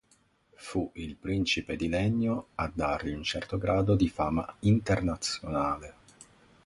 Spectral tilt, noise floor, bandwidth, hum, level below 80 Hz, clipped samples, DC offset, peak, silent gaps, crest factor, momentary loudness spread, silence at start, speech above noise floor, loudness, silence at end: -6 dB/octave; -67 dBFS; 11.5 kHz; none; -46 dBFS; under 0.1%; under 0.1%; -12 dBFS; none; 18 dB; 9 LU; 0.6 s; 38 dB; -30 LUFS; 0.4 s